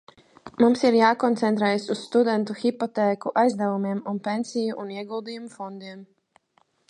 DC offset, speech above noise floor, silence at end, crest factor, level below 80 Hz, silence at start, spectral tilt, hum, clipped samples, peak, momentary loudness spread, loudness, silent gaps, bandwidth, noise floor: under 0.1%; 43 dB; 0.85 s; 20 dB; -72 dBFS; 0.45 s; -6 dB/octave; none; under 0.1%; -4 dBFS; 17 LU; -23 LUFS; none; 11 kHz; -66 dBFS